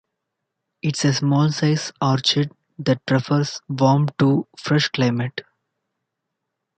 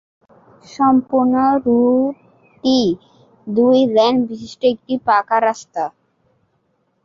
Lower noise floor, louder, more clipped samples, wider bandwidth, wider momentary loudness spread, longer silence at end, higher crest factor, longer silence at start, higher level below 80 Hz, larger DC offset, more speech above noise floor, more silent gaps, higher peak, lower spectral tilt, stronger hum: first, -80 dBFS vs -65 dBFS; second, -20 LUFS vs -16 LUFS; neither; first, 9 kHz vs 7.4 kHz; second, 8 LU vs 12 LU; first, 1.4 s vs 1.15 s; about the same, 18 dB vs 14 dB; first, 0.85 s vs 0.7 s; about the same, -62 dBFS vs -58 dBFS; neither; first, 60 dB vs 49 dB; neither; about the same, -4 dBFS vs -2 dBFS; about the same, -5.5 dB/octave vs -5.5 dB/octave; neither